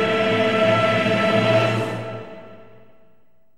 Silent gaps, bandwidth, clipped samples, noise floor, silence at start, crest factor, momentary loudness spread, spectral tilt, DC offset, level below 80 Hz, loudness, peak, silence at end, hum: none; 12.5 kHz; under 0.1%; -61 dBFS; 0 s; 16 dB; 15 LU; -6 dB/octave; 0.6%; -60 dBFS; -19 LUFS; -6 dBFS; 0.95 s; none